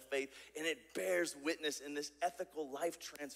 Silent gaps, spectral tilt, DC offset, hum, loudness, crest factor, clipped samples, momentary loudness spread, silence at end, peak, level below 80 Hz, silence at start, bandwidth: none; -2 dB/octave; under 0.1%; none; -41 LUFS; 18 dB; under 0.1%; 8 LU; 0 s; -24 dBFS; -80 dBFS; 0 s; 16 kHz